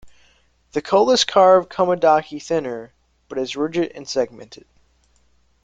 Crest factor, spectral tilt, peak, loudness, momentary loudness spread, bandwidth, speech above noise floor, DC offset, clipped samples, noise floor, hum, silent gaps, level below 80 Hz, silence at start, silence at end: 18 dB; -4 dB/octave; -2 dBFS; -18 LUFS; 15 LU; 9.2 kHz; 43 dB; under 0.1%; under 0.1%; -61 dBFS; none; none; -58 dBFS; 0.05 s; 1.1 s